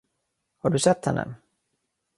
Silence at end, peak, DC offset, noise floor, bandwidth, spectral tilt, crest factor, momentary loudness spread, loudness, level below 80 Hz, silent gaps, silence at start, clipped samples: 0.85 s; -6 dBFS; under 0.1%; -78 dBFS; 11.5 kHz; -5 dB/octave; 22 dB; 10 LU; -24 LUFS; -58 dBFS; none; 0.65 s; under 0.1%